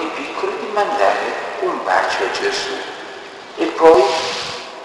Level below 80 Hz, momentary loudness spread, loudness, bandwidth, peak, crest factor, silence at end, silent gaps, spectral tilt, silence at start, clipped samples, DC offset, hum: -56 dBFS; 16 LU; -17 LUFS; 12 kHz; 0 dBFS; 18 dB; 0 s; none; -2.5 dB/octave; 0 s; under 0.1%; under 0.1%; none